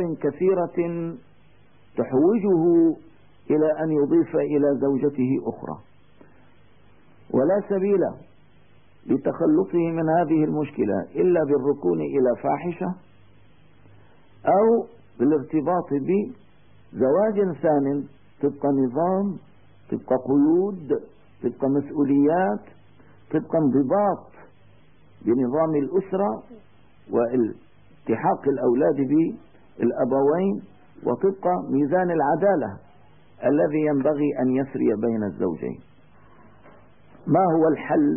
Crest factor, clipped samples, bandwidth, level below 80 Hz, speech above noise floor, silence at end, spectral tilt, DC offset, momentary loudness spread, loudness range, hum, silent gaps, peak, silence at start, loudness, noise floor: 14 dB; under 0.1%; 3.3 kHz; -64 dBFS; 35 dB; 0 s; -13 dB/octave; 0.3%; 11 LU; 4 LU; none; none; -8 dBFS; 0 s; -23 LUFS; -57 dBFS